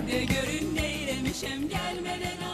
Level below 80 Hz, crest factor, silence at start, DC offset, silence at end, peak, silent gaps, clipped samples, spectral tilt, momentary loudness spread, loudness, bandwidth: -44 dBFS; 16 dB; 0 s; under 0.1%; 0 s; -14 dBFS; none; under 0.1%; -4 dB/octave; 5 LU; -30 LUFS; 14 kHz